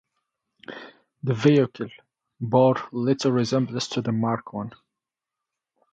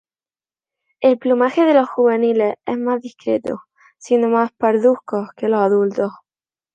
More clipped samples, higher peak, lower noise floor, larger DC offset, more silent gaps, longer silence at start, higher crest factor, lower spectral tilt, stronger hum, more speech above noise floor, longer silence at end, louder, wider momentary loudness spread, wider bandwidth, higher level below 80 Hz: neither; about the same, -4 dBFS vs -2 dBFS; about the same, -87 dBFS vs under -90 dBFS; neither; neither; second, 0.7 s vs 1 s; about the same, 20 dB vs 16 dB; about the same, -6.5 dB/octave vs -6.5 dB/octave; neither; second, 64 dB vs over 73 dB; first, 1.2 s vs 0.65 s; second, -23 LUFS vs -17 LUFS; first, 19 LU vs 9 LU; about the same, 9 kHz vs 8.4 kHz; about the same, -66 dBFS vs -70 dBFS